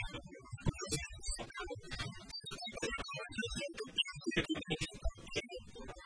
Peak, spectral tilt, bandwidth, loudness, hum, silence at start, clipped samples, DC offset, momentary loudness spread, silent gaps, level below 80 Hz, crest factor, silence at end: -20 dBFS; -3.5 dB/octave; 10.5 kHz; -41 LUFS; none; 0 s; under 0.1%; under 0.1%; 9 LU; none; -50 dBFS; 22 dB; 0 s